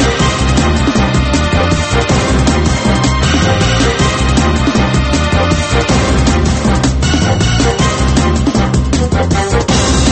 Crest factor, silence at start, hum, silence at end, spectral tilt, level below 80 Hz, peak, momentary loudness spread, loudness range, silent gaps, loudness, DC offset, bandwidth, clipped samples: 10 dB; 0 s; none; 0 s; -5 dB/octave; -18 dBFS; 0 dBFS; 2 LU; 0 LU; none; -12 LUFS; under 0.1%; 8.8 kHz; under 0.1%